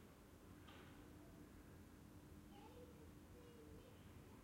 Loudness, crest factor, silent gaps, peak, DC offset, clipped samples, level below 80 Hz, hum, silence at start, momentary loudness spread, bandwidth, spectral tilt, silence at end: -63 LUFS; 12 dB; none; -50 dBFS; under 0.1%; under 0.1%; -72 dBFS; none; 0 s; 2 LU; 16 kHz; -5.5 dB/octave; 0 s